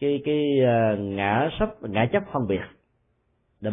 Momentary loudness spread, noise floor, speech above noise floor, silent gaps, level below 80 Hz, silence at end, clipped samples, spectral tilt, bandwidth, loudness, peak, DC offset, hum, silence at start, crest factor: 8 LU; -69 dBFS; 46 dB; none; -48 dBFS; 0 s; under 0.1%; -11.5 dB/octave; 3.9 kHz; -24 LUFS; -8 dBFS; under 0.1%; none; 0 s; 16 dB